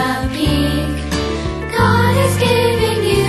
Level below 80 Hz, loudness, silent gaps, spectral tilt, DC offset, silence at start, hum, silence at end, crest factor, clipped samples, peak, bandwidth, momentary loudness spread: -28 dBFS; -16 LUFS; none; -5.5 dB/octave; under 0.1%; 0 s; none; 0 s; 14 dB; under 0.1%; -2 dBFS; 12.5 kHz; 7 LU